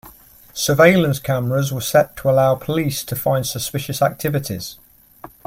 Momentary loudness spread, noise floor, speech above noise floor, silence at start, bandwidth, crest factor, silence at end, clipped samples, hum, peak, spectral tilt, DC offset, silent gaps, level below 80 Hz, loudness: 11 LU; -45 dBFS; 27 dB; 0.05 s; 16.5 kHz; 18 dB; 0.2 s; under 0.1%; none; 0 dBFS; -5 dB/octave; under 0.1%; none; -50 dBFS; -18 LUFS